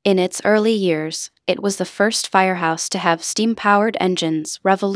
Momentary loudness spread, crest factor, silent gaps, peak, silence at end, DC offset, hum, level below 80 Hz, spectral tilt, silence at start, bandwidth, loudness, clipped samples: 6 LU; 18 dB; none; 0 dBFS; 0 s; under 0.1%; none; -68 dBFS; -4 dB/octave; 0.05 s; 11 kHz; -18 LUFS; under 0.1%